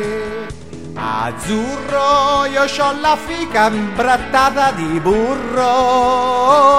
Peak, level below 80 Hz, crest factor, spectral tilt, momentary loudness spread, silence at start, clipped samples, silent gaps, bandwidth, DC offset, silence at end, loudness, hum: 0 dBFS; -40 dBFS; 14 dB; -4 dB/octave; 10 LU; 0 s; under 0.1%; none; 15.5 kHz; 1%; 0 s; -15 LUFS; none